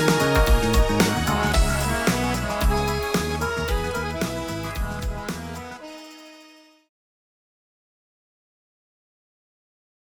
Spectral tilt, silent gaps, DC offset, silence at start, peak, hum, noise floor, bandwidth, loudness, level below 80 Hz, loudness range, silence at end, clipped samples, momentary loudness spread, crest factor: -4.5 dB/octave; none; under 0.1%; 0 s; -8 dBFS; none; -51 dBFS; 19 kHz; -23 LUFS; -28 dBFS; 17 LU; 3.65 s; under 0.1%; 16 LU; 18 dB